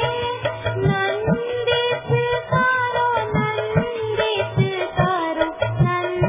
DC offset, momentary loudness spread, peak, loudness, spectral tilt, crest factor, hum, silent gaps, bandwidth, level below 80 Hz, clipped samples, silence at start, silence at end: under 0.1%; 4 LU; -4 dBFS; -21 LUFS; -10 dB/octave; 16 dB; none; none; 3.8 kHz; -42 dBFS; under 0.1%; 0 s; 0 s